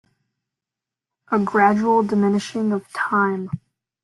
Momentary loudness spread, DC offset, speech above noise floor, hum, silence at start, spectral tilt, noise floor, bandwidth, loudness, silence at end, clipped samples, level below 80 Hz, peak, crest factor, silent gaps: 10 LU; under 0.1%; 68 dB; none; 1.3 s; -6.5 dB/octave; -87 dBFS; 11.5 kHz; -20 LUFS; 0.45 s; under 0.1%; -64 dBFS; -4 dBFS; 18 dB; none